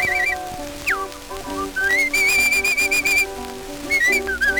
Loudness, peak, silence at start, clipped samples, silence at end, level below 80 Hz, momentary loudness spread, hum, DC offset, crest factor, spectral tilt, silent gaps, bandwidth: -18 LUFS; -4 dBFS; 0 s; under 0.1%; 0 s; -42 dBFS; 16 LU; none; under 0.1%; 16 dB; -1 dB/octave; none; over 20 kHz